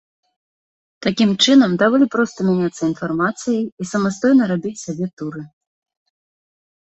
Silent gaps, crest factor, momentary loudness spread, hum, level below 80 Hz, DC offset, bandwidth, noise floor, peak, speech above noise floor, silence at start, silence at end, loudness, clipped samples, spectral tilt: 3.72-3.77 s, 5.13-5.17 s; 16 dB; 14 LU; none; -60 dBFS; under 0.1%; 8.2 kHz; under -90 dBFS; -2 dBFS; over 73 dB; 1 s; 1.35 s; -17 LUFS; under 0.1%; -5 dB/octave